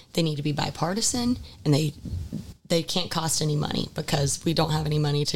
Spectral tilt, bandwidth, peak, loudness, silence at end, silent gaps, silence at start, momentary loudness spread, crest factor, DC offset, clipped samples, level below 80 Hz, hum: -4.5 dB/octave; 17 kHz; -10 dBFS; -26 LUFS; 0 s; none; 0 s; 6 LU; 16 dB; 0.6%; under 0.1%; -46 dBFS; none